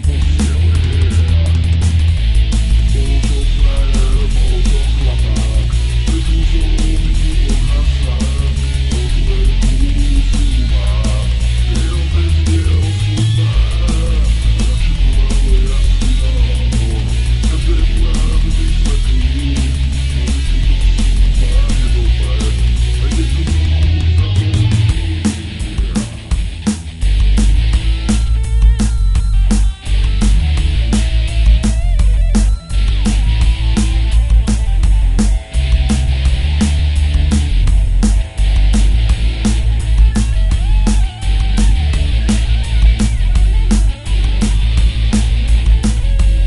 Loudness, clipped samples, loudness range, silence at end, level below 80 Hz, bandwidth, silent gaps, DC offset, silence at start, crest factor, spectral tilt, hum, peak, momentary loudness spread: -15 LUFS; under 0.1%; 1 LU; 0 s; -12 dBFS; 11.5 kHz; none; 0.5%; 0 s; 10 dB; -5.5 dB/octave; none; 0 dBFS; 3 LU